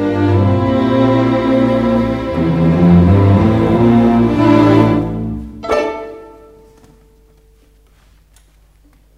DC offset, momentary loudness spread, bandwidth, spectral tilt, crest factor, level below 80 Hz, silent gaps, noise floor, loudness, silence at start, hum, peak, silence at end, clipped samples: under 0.1%; 11 LU; 8.4 kHz; -9 dB/octave; 14 dB; -32 dBFS; none; -48 dBFS; -12 LUFS; 0 s; none; 0 dBFS; 2.9 s; under 0.1%